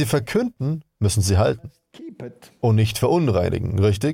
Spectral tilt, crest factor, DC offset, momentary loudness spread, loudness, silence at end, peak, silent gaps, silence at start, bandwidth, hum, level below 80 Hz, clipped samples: -6 dB/octave; 14 dB; under 0.1%; 19 LU; -21 LUFS; 0 s; -6 dBFS; none; 0 s; 16.5 kHz; none; -42 dBFS; under 0.1%